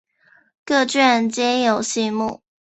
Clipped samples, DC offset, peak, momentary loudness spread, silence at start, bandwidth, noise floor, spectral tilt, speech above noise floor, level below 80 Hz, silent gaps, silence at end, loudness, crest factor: under 0.1%; under 0.1%; -2 dBFS; 8 LU; 0.65 s; 8.2 kHz; -57 dBFS; -3 dB/octave; 38 dB; -64 dBFS; none; 0.25 s; -19 LUFS; 18 dB